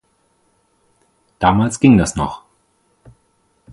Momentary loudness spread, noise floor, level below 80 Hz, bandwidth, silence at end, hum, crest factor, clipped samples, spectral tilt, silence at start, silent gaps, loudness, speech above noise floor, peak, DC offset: 13 LU; -62 dBFS; -40 dBFS; 11.5 kHz; 1.35 s; none; 18 dB; under 0.1%; -6 dB/octave; 1.4 s; none; -15 LUFS; 48 dB; 0 dBFS; under 0.1%